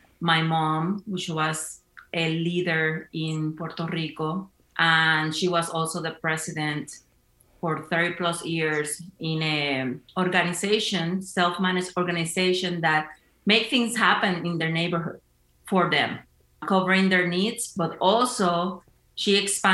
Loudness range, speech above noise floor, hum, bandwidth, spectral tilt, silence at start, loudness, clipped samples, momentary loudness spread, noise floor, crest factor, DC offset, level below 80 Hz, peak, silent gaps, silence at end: 4 LU; 37 dB; none; 13 kHz; -4 dB/octave; 0.2 s; -24 LUFS; under 0.1%; 11 LU; -62 dBFS; 22 dB; under 0.1%; -66 dBFS; -4 dBFS; none; 0 s